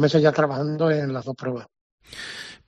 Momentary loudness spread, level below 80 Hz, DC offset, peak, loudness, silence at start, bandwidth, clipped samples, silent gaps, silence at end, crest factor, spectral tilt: 17 LU; -62 dBFS; under 0.1%; -4 dBFS; -23 LUFS; 0 s; 10.5 kHz; under 0.1%; 1.81-1.98 s; 0.15 s; 18 dB; -7 dB/octave